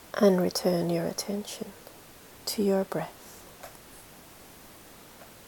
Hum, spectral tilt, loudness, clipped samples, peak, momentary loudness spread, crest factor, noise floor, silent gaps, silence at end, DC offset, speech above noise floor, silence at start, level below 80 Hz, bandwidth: none; -5 dB/octave; -28 LUFS; under 0.1%; -10 dBFS; 24 LU; 20 dB; -51 dBFS; none; 0 s; under 0.1%; 23 dB; 0 s; -64 dBFS; 18 kHz